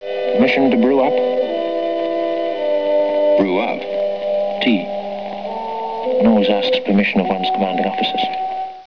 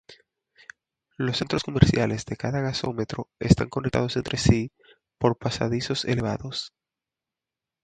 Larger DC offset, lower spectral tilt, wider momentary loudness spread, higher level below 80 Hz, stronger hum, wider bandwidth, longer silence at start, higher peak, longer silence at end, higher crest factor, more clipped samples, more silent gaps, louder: first, 0.7% vs under 0.1%; first, -7.5 dB/octave vs -6 dB/octave; about the same, 10 LU vs 11 LU; second, -56 dBFS vs -42 dBFS; neither; second, 5.4 kHz vs 9.4 kHz; about the same, 0 s vs 0.1 s; second, -6 dBFS vs 0 dBFS; second, 0 s vs 1.15 s; second, 12 dB vs 26 dB; neither; neither; first, -18 LUFS vs -25 LUFS